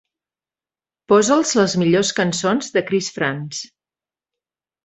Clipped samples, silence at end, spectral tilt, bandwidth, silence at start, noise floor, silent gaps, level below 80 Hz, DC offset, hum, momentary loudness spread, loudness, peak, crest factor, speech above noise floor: under 0.1%; 1.2 s; -4 dB/octave; 8.2 kHz; 1.1 s; under -90 dBFS; none; -60 dBFS; under 0.1%; none; 13 LU; -18 LUFS; -2 dBFS; 18 dB; over 72 dB